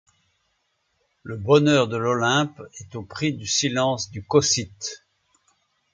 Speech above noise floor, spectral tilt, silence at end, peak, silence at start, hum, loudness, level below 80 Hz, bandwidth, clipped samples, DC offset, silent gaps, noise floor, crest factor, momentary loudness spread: 49 dB; -4 dB/octave; 1 s; -2 dBFS; 1.25 s; none; -22 LUFS; -56 dBFS; 9.6 kHz; under 0.1%; under 0.1%; none; -71 dBFS; 22 dB; 18 LU